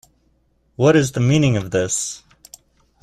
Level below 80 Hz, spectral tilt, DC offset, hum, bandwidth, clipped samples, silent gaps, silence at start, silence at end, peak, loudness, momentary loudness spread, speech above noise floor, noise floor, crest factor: -48 dBFS; -5.5 dB/octave; under 0.1%; none; 14 kHz; under 0.1%; none; 0.8 s; 0.85 s; -2 dBFS; -18 LUFS; 10 LU; 45 dB; -62 dBFS; 18 dB